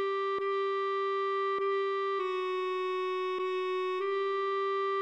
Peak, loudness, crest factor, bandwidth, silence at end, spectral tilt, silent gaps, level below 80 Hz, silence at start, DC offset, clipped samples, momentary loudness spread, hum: -22 dBFS; -32 LUFS; 8 dB; 7.8 kHz; 0 s; -3.5 dB/octave; none; -84 dBFS; 0 s; under 0.1%; under 0.1%; 2 LU; none